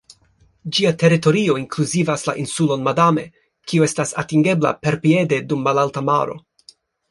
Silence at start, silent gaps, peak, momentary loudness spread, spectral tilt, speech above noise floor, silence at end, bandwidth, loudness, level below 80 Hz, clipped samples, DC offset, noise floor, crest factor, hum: 0.65 s; none; -2 dBFS; 8 LU; -5.5 dB/octave; 40 dB; 0.7 s; 11.5 kHz; -18 LUFS; -58 dBFS; under 0.1%; under 0.1%; -57 dBFS; 16 dB; none